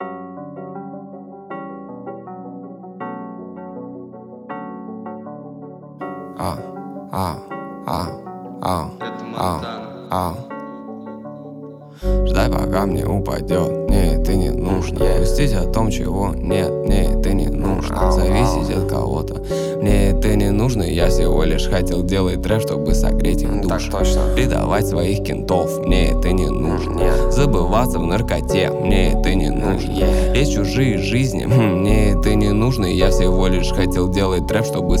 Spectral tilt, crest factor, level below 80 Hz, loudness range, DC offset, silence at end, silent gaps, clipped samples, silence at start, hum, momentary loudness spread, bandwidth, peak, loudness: -6.5 dB/octave; 16 dB; -22 dBFS; 15 LU; under 0.1%; 0 s; none; under 0.1%; 0 s; none; 16 LU; 16 kHz; -2 dBFS; -19 LUFS